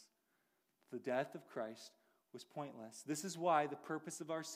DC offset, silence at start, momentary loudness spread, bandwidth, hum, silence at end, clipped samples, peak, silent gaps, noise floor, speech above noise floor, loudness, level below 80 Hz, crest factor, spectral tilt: under 0.1%; 0 s; 19 LU; 15.5 kHz; none; 0 s; under 0.1%; -22 dBFS; none; -82 dBFS; 39 dB; -43 LUFS; under -90 dBFS; 22 dB; -4 dB/octave